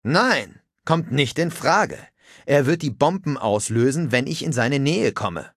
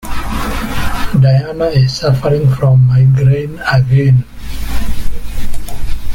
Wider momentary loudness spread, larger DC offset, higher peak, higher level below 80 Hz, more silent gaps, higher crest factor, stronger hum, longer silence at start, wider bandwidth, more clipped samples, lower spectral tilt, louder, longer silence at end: second, 7 LU vs 17 LU; neither; about the same, -2 dBFS vs 0 dBFS; second, -54 dBFS vs -22 dBFS; neither; first, 18 dB vs 10 dB; neither; about the same, 0.05 s vs 0.05 s; second, 14.5 kHz vs 16.5 kHz; neither; second, -5 dB/octave vs -7 dB/octave; second, -21 LUFS vs -12 LUFS; about the same, 0.1 s vs 0 s